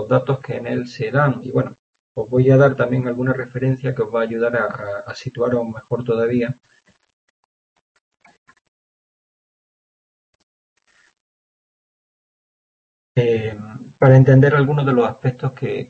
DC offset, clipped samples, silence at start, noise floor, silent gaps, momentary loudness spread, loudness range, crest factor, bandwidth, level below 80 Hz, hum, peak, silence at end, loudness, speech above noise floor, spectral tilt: under 0.1%; under 0.1%; 0 s; under -90 dBFS; 1.79-1.93 s, 1.99-2.15 s, 7.13-7.95 s, 8.01-8.11 s, 8.38-8.46 s, 8.61-10.76 s, 11.20-13.15 s; 16 LU; 11 LU; 20 dB; 6.6 kHz; -56 dBFS; none; 0 dBFS; 0.05 s; -18 LUFS; over 73 dB; -9 dB/octave